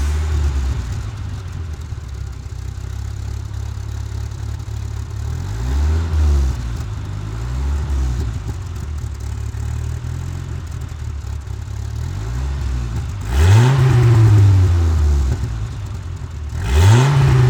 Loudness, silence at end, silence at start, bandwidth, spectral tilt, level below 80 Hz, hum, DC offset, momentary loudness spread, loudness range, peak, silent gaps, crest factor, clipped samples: -19 LUFS; 0 s; 0 s; 15.5 kHz; -6.5 dB/octave; -22 dBFS; none; under 0.1%; 16 LU; 13 LU; 0 dBFS; none; 16 dB; under 0.1%